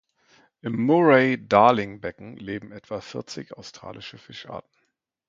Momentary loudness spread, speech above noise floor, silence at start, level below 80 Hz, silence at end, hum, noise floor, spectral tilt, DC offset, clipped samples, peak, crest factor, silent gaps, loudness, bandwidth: 22 LU; 51 dB; 0.65 s; -62 dBFS; 0.7 s; none; -74 dBFS; -6.5 dB/octave; under 0.1%; under 0.1%; -2 dBFS; 22 dB; none; -20 LUFS; 7.6 kHz